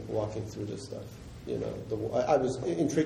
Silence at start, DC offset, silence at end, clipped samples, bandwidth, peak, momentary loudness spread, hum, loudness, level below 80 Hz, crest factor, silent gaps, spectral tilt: 0 s; under 0.1%; 0 s; under 0.1%; 15 kHz; -12 dBFS; 15 LU; none; -32 LUFS; -54 dBFS; 18 dB; none; -6.5 dB/octave